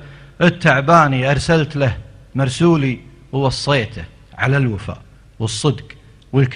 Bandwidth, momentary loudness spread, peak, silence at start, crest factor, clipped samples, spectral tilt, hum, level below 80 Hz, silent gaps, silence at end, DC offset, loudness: 11 kHz; 17 LU; 0 dBFS; 0 s; 16 dB; under 0.1%; -6 dB/octave; none; -40 dBFS; none; 0 s; under 0.1%; -17 LUFS